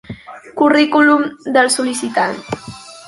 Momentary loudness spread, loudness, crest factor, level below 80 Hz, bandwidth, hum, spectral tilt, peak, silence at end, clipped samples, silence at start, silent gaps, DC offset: 21 LU; -14 LUFS; 14 dB; -54 dBFS; 11.5 kHz; none; -3 dB/octave; -2 dBFS; 0 s; under 0.1%; 0.1 s; none; under 0.1%